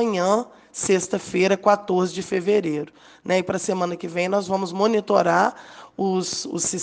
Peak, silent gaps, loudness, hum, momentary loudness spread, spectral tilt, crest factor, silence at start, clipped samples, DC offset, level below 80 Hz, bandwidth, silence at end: -4 dBFS; none; -22 LUFS; none; 9 LU; -4.5 dB/octave; 18 dB; 0 s; under 0.1%; under 0.1%; -64 dBFS; 10 kHz; 0 s